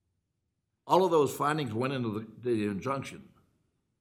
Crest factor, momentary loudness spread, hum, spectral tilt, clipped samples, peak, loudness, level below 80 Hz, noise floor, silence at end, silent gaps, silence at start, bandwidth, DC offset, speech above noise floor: 22 dB; 11 LU; none; -6 dB/octave; under 0.1%; -8 dBFS; -30 LUFS; -70 dBFS; -81 dBFS; 0.8 s; none; 0.85 s; 16.5 kHz; under 0.1%; 52 dB